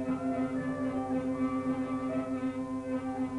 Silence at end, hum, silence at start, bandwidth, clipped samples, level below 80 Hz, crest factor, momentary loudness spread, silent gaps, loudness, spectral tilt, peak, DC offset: 0 s; none; 0 s; 11 kHz; under 0.1%; -60 dBFS; 12 dB; 3 LU; none; -33 LUFS; -7.5 dB/octave; -20 dBFS; under 0.1%